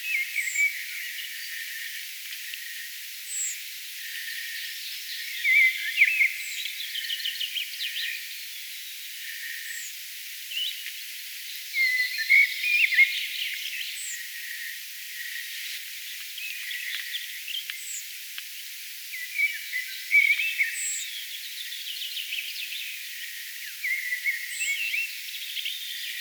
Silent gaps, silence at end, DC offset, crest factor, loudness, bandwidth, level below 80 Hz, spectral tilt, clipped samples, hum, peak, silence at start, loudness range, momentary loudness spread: none; 0 s; under 0.1%; 20 dB; -27 LUFS; over 20 kHz; under -90 dBFS; 13 dB/octave; under 0.1%; none; -8 dBFS; 0 s; 10 LU; 15 LU